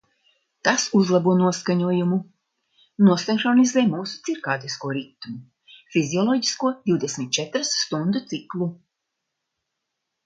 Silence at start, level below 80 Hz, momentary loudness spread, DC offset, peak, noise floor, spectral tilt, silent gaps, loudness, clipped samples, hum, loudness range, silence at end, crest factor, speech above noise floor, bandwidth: 0.65 s; -70 dBFS; 12 LU; under 0.1%; -2 dBFS; -80 dBFS; -4.5 dB/octave; none; -22 LUFS; under 0.1%; none; 5 LU; 1.5 s; 22 dB; 59 dB; 9.2 kHz